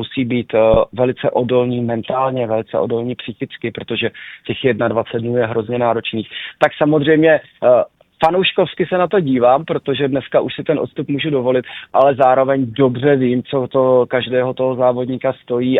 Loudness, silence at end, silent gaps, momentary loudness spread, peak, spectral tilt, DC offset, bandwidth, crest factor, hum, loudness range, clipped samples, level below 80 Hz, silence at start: -16 LUFS; 0 s; none; 8 LU; 0 dBFS; -8.5 dB/octave; under 0.1%; 5.2 kHz; 16 dB; none; 5 LU; under 0.1%; -46 dBFS; 0 s